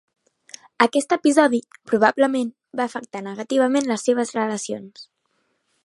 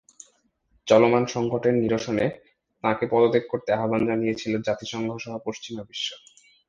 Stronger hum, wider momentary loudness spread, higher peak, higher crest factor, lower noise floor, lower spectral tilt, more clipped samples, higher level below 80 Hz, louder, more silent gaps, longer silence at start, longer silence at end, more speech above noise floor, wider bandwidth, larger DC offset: neither; about the same, 14 LU vs 13 LU; first, 0 dBFS vs -4 dBFS; about the same, 22 dB vs 20 dB; about the same, -70 dBFS vs -67 dBFS; second, -4 dB/octave vs -5.5 dB/octave; neither; second, -72 dBFS vs -60 dBFS; first, -21 LUFS vs -24 LUFS; neither; about the same, 0.8 s vs 0.85 s; first, 0.85 s vs 0.5 s; first, 50 dB vs 43 dB; first, 11.5 kHz vs 7.8 kHz; neither